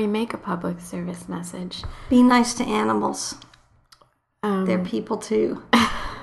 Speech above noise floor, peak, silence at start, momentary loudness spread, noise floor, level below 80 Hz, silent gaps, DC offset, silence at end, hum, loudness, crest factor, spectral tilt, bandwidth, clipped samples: 37 dB; -2 dBFS; 0 s; 15 LU; -60 dBFS; -46 dBFS; none; under 0.1%; 0 s; none; -23 LUFS; 20 dB; -4.5 dB/octave; 12.5 kHz; under 0.1%